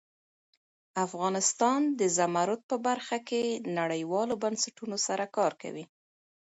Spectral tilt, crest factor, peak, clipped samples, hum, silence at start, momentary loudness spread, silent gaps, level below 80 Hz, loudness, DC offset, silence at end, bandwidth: -3.5 dB/octave; 18 dB; -12 dBFS; under 0.1%; none; 0.95 s; 7 LU; 2.63-2.69 s; -80 dBFS; -30 LUFS; under 0.1%; 0.75 s; 8.4 kHz